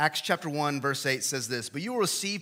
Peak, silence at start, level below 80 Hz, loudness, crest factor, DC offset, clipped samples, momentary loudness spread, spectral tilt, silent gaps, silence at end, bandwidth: -10 dBFS; 0 s; -78 dBFS; -29 LUFS; 20 dB; under 0.1%; under 0.1%; 5 LU; -3 dB/octave; none; 0 s; 16.5 kHz